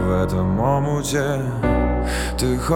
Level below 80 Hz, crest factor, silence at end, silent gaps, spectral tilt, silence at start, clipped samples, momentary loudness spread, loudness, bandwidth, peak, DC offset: -28 dBFS; 14 dB; 0 s; none; -6 dB/octave; 0 s; under 0.1%; 3 LU; -21 LUFS; 18 kHz; -6 dBFS; under 0.1%